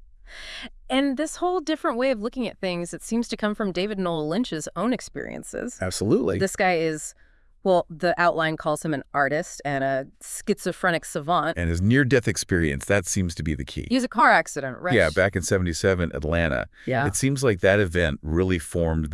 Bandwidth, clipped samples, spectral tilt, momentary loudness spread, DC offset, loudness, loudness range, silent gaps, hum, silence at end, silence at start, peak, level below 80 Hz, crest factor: 12 kHz; under 0.1%; -5 dB/octave; 9 LU; under 0.1%; -24 LUFS; 4 LU; none; none; 0 s; 0.25 s; -4 dBFS; -44 dBFS; 20 dB